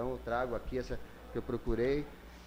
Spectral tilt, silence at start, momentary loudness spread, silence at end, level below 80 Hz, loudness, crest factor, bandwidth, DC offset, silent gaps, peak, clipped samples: -7 dB/octave; 0 s; 11 LU; 0 s; -46 dBFS; -37 LUFS; 16 dB; 16 kHz; under 0.1%; none; -20 dBFS; under 0.1%